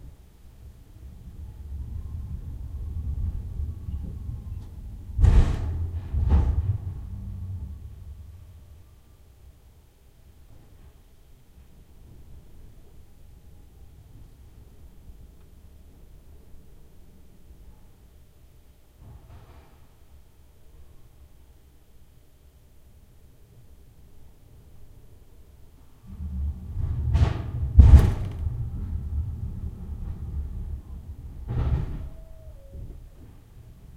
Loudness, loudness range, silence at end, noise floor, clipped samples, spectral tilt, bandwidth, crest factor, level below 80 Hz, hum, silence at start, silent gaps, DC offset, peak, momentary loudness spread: -27 LUFS; 18 LU; 0 s; -54 dBFS; under 0.1%; -8.5 dB/octave; 7.6 kHz; 28 dB; -30 dBFS; none; 0.05 s; none; under 0.1%; -2 dBFS; 27 LU